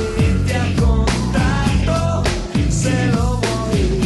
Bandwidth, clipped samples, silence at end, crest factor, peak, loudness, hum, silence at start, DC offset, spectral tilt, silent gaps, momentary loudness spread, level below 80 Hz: 12 kHz; under 0.1%; 0 s; 12 dB; -4 dBFS; -18 LUFS; none; 0 s; under 0.1%; -6 dB/octave; none; 3 LU; -22 dBFS